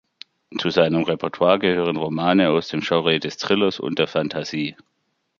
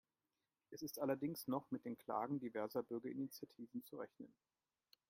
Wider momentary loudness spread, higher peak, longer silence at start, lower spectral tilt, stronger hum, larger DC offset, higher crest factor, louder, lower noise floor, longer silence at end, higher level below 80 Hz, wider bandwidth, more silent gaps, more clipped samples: second, 8 LU vs 12 LU; first, -2 dBFS vs -26 dBFS; second, 0.5 s vs 0.7 s; about the same, -6 dB/octave vs -6 dB/octave; neither; neither; about the same, 20 dB vs 20 dB; first, -21 LUFS vs -46 LUFS; second, -72 dBFS vs under -90 dBFS; second, 0.65 s vs 0.8 s; first, -58 dBFS vs -88 dBFS; second, 7.4 kHz vs 16 kHz; neither; neither